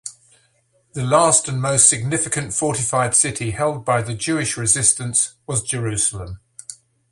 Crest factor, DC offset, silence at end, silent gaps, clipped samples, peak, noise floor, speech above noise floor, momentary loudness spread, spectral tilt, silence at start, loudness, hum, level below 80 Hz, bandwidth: 20 dB; under 0.1%; 0.35 s; none; under 0.1%; 0 dBFS; -62 dBFS; 43 dB; 21 LU; -3 dB/octave; 0.05 s; -17 LUFS; none; -48 dBFS; 11.5 kHz